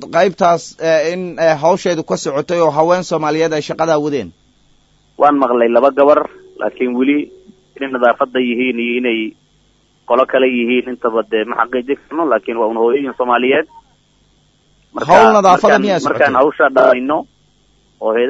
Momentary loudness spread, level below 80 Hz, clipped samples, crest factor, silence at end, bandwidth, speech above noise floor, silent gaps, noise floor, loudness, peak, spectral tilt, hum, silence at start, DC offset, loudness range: 10 LU; -54 dBFS; under 0.1%; 14 dB; 0 s; 8 kHz; 42 dB; none; -55 dBFS; -14 LUFS; 0 dBFS; -5 dB/octave; 50 Hz at -55 dBFS; 0 s; under 0.1%; 5 LU